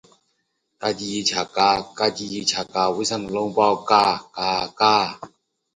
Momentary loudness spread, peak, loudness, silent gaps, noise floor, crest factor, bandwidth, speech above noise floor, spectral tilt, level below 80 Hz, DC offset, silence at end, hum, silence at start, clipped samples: 8 LU; -2 dBFS; -21 LUFS; none; -72 dBFS; 22 dB; 11 kHz; 51 dB; -3 dB/octave; -58 dBFS; under 0.1%; 0.5 s; none; 0.8 s; under 0.1%